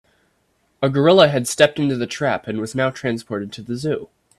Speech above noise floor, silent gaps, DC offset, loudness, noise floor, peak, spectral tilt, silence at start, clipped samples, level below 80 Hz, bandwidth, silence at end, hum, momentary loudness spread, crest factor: 46 dB; none; under 0.1%; -19 LUFS; -65 dBFS; 0 dBFS; -5 dB/octave; 0.8 s; under 0.1%; -58 dBFS; 14 kHz; 0.35 s; none; 14 LU; 20 dB